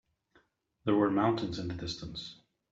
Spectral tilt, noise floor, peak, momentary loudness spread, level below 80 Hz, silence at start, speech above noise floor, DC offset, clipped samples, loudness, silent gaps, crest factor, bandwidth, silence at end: -6.5 dB/octave; -70 dBFS; -16 dBFS; 14 LU; -60 dBFS; 0.85 s; 38 dB; under 0.1%; under 0.1%; -32 LUFS; none; 18 dB; 7.8 kHz; 0.4 s